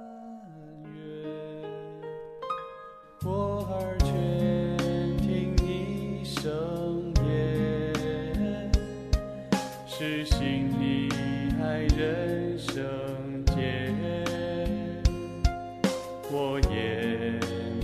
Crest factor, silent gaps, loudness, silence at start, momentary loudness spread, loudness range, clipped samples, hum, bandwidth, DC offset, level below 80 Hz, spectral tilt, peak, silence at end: 20 dB; none; -30 LUFS; 0 s; 13 LU; 3 LU; under 0.1%; none; 14 kHz; under 0.1%; -34 dBFS; -6.5 dB/octave; -10 dBFS; 0 s